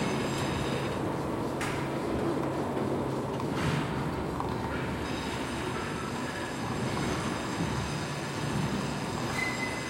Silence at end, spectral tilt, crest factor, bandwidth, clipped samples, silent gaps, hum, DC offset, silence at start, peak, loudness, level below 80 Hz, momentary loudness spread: 0 s; -5.5 dB/octave; 14 dB; 16.5 kHz; under 0.1%; none; none; under 0.1%; 0 s; -16 dBFS; -32 LUFS; -50 dBFS; 3 LU